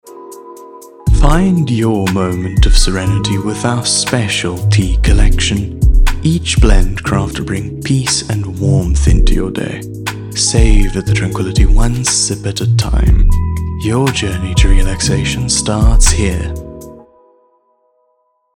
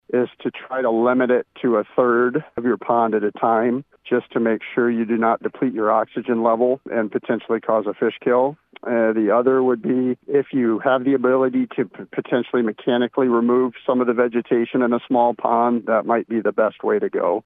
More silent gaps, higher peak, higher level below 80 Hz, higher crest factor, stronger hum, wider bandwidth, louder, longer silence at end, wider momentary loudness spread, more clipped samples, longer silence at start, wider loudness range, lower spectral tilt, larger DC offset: neither; first, 0 dBFS vs -4 dBFS; first, -14 dBFS vs -72 dBFS; about the same, 12 dB vs 16 dB; neither; first, 14.5 kHz vs 3.9 kHz; first, -14 LUFS vs -20 LUFS; first, 1.6 s vs 0.05 s; first, 9 LU vs 6 LU; first, 0.2% vs under 0.1%; about the same, 0.05 s vs 0.1 s; about the same, 2 LU vs 2 LU; second, -4.5 dB/octave vs -10 dB/octave; neither